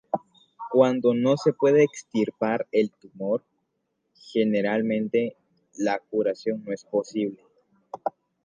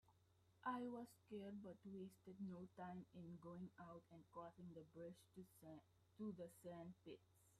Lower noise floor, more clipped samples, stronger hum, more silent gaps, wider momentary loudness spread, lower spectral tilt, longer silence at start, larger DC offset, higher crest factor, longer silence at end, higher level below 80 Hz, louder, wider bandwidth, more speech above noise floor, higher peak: about the same, -76 dBFS vs -78 dBFS; neither; neither; neither; about the same, 12 LU vs 12 LU; about the same, -6.5 dB/octave vs -7 dB/octave; about the same, 0.15 s vs 0.05 s; neither; about the same, 20 dB vs 20 dB; first, 0.35 s vs 0 s; first, -76 dBFS vs -88 dBFS; first, -25 LUFS vs -58 LUFS; second, 9.2 kHz vs 14 kHz; first, 53 dB vs 21 dB; first, -6 dBFS vs -36 dBFS